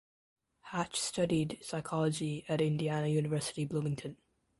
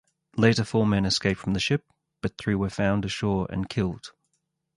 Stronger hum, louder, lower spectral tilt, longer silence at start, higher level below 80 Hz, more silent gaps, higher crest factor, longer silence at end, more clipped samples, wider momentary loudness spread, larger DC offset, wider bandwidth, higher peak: neither; second, -34 LUFS vs -26 LUFS; about the same, -5.5 dB/octave vs -5.5 dB/octave; first, 0.65 s vs 0.35 s; second, -66 dBFS vs -48 dBFS; neither; about the same, 16 dB vs 20 dB; second, 0.45 s vs 0.7 s; neither; second, 7 LU vs 12 LU; neither; about the same, 11.5 kHz vs 11.5 kHz; second, -18 dBFS vs -6 dBFS